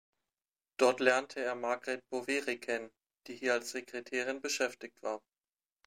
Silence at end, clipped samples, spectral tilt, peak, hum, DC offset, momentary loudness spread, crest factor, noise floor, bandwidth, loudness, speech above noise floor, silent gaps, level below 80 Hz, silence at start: 0.7 s; under 0.1%; -2 dB/octave; -12 dBFS; none; under 0.1%; 13 LU; 24 dB; under -90 dBFS; 16 kHz; -34 LUFS; over 56 dB; none; -86 dBFS; 0.8 s